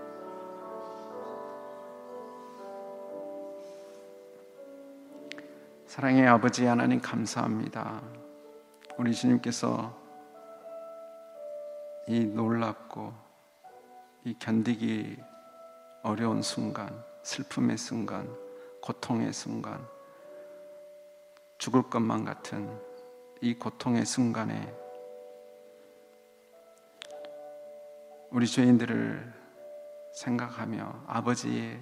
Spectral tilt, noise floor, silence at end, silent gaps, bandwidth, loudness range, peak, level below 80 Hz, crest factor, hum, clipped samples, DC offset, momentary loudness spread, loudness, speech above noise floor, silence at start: -5.5 dB/octave; -58 dBFS; 0 s; none; 12.5 kHz; 16 LU; -4 dBFS; -80 dBFS; 28 dB; none; under 0.1%; under 0.1%; 24 LU; -31 LUFS; 29 dB; 0 s